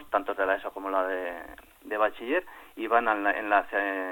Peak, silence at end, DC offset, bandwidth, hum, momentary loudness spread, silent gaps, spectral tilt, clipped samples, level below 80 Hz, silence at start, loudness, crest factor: -8 dBFS; 0 s; under 0.1%; 17.5 kHz; none; 14 LU; none; -4.5 dB/octave; under 0.1%; -62 dBFS; 0 s; -28 LUFS; 20 dB